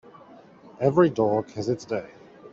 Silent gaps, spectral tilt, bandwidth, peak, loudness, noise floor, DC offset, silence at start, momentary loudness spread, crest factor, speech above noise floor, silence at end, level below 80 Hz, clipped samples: none; -7.5 dB/octave; 7.6 kHz; -6 dBFS; -24 LUFS; -50 dBFS; under 0.1%; 0.8 s; 11 LU; 20 dB; 26 dB; 0.05 s; -64 dBFS; under 0.1%